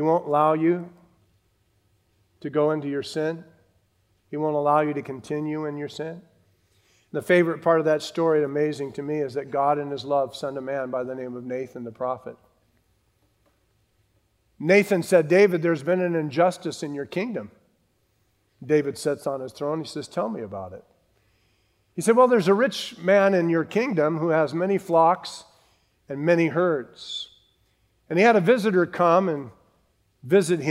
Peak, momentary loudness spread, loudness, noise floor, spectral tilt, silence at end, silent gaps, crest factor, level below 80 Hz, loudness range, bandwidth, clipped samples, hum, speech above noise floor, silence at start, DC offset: -4 dBFS; 15 LU; -23 LUFS; -68 dBFS; -6 dB/octave; 0 s; none; 20 dB; -72 dBFS; 8 LU; 16 kHz; under 0.1%; none; 45 dB; 0 s; under 0.1%